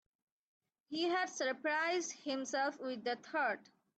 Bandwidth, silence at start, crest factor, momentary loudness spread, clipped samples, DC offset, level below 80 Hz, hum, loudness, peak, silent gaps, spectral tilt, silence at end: 8.8 kHz; 0.9 s; 14 dB; 6 LU; under 0.1%; under 0.1%; -90 dBFS; none; -37 LUFS; -24 dBFS; none; -1.5 dB/octave; 0.35 s